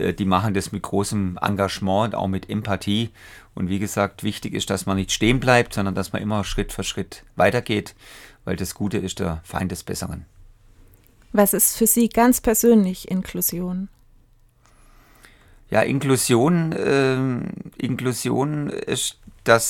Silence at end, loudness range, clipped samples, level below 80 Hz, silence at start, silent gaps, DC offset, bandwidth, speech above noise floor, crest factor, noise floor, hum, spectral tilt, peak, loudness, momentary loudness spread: 0 s; 6 LU; under 0.1%; -42 dBFS; 0 s; none; under 0.1%; 19 kHz; 34 dB; 22 dB; -55 dBFS; none; -4.5 dB/octave; 0 dBFS; -22 LUFS; 12 LU